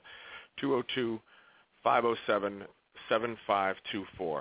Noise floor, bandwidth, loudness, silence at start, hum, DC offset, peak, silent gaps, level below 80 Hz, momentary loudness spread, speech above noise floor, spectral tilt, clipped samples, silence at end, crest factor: -62 dBFS; 4 kHz; -32 LUFS; 0.05 s; none; under 0.1%; -12 dBFS; none; -70 dBFS; 18 LU; 31 dB; -2.5 dB/octave; under 0.1%; 0 s; 20 dB